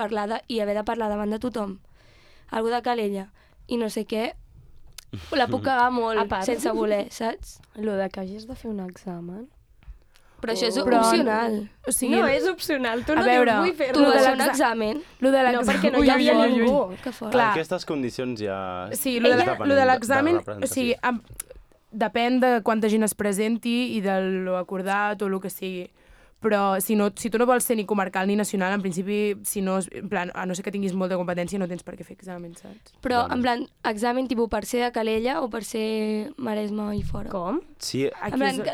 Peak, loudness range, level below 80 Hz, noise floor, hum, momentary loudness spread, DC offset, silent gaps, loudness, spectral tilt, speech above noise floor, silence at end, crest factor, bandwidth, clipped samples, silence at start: -6 dBFS; 8 LU; -50 dBFS; -52 dBFS; none; 14 LU; under 0.1%; none; -24 LUFS; -4.5 dB/octave; 29 dB; 0 s; 20 dB; 19.5 kHz; under 0.1%; 0 s